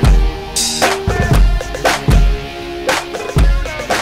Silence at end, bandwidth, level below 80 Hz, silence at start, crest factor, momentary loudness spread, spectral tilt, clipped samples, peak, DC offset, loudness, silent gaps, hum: 0 s; 15.5 kHz; -16 dBFS; 0 s; 12 dB; 6 LU; -4 dB/octave; under 0.1%; 0 dBFS; under 0.1%; -16 LUFS; none; none